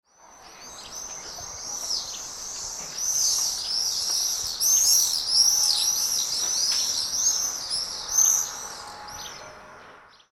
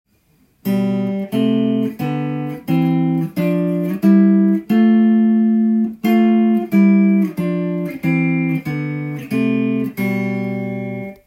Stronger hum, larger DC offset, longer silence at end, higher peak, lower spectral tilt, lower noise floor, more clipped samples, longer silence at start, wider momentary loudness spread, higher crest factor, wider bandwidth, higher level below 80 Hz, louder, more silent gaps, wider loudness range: neither; neither; first, 0.3 s vs 0.15 s; about the same, -6 dBFS vs -4 dBFS; second, 2.5 dB/octave vs -8.5 dB/octave; second, -50 dBFS vs -57 dBFS; neither; second, 0.25 s vs 0.65 s; first, 19 LU vs 10 LU; first, 20 dB vs 14 dB; first, 19 kHz vs 16 kHz; about the same, -58 dBFS vs -60 dBFS; second, -22 LUFS vs -17 LUFS; neither; about the same, 7 LU vs 6 LU